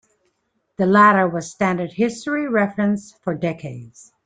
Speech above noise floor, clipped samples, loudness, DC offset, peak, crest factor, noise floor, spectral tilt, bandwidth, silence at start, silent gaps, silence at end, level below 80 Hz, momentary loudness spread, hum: 51 dB; under 0.1%; -19 LUFS; under 0.1%; -2 dBFS; 18 dB; -70 dBFS; -6.5 dB/octave; 9.2 kHz; 0.8 s; none; 0.35 s; -60 dBFS; 18 LU; none